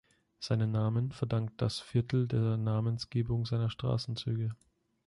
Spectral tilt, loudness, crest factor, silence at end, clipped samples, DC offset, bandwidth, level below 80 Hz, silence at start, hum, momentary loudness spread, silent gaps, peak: -7.5 dB/octave; -33 LUFS; 14 dB; 0.5 s; under 0.1%; under 0.1%; 11.5 kHz; -56 dBFS; 0.4 s; none; 5 LU; none; -18 dBFS